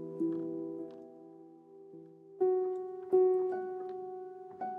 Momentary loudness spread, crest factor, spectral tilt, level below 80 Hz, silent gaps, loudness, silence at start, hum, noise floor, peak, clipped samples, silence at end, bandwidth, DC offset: 25 LU; 18 dB; -10 dB/octave; under -90 dBFS; none; -34 LUFS; 0 s; none; -55 dBFS; -18 dBFS; under 0.1%; 0 s; 2.4 kHz; under 0.1%